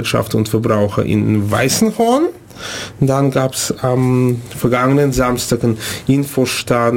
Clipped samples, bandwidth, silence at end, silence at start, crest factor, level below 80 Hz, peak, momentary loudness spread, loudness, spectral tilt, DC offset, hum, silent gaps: under 0.1%; 17 kHz; 0 s; 0 s; 12 dB; -40 dBFS; -2 dBFS; 5 LU; -15 LUFS; -5.5 dB/octave; under 0.1%; none; none